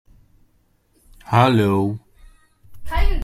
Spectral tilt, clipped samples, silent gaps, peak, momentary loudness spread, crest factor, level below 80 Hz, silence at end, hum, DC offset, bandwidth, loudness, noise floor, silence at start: -7.5 dB/octave; under 0.1%; none; -2 dBFS; 12 LU; 20 dB; -28 dBFS; 0 s; none; under 0.1%; 14 kHz; -19 LUFS; -61 dBFS; 1.3 s